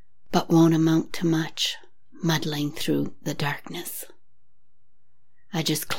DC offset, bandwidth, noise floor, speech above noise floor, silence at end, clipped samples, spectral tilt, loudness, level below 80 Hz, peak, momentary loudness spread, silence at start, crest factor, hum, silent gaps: 1%; 17 kHz; -73 dBFS; 49 dB; 0 s; under 0.1%; -5 dB/octave; -25 LUFS; -60 dBFS; -6 dBFS; 14 LU; 0.3 s; 20 dB; none; none